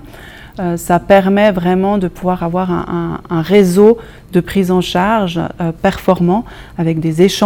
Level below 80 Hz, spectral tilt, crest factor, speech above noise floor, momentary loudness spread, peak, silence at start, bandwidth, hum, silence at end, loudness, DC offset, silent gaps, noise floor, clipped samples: -38 dBFS; -6.5 dB/octave; 14 dB; 21 dB; 10 LU; 0 dBFS; 0.05 s; 17 kHz; none; 0 s; -14 LUFS; under 0.1%; none; -34 dBFS; 0.4%